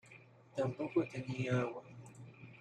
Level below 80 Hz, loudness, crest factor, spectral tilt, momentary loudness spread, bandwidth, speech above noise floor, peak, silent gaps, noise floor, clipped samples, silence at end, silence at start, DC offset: -76 dBFS; -38 LUFS; 18 dB; -7.5 dB/octave; 19 LU; 9.8 kHz; 23 dB; -22 dBFS; none; -60 dBFS; under 0.1%; 0 s; 0.05 s; under 0.1%